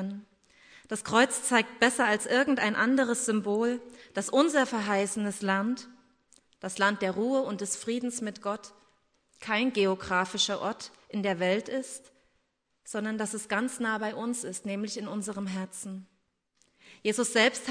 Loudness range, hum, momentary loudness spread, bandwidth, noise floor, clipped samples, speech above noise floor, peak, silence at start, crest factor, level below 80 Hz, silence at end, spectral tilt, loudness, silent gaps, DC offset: 7 LU; none; 13 LU; 11 kHz; -75 dBFS; under 0.1%; 46 dB; -8 dBFS; 0 s; 22 dB; -70 dBFS; 0 s; -3.5 dB/octave; -29 LUFS; none; under 0.1%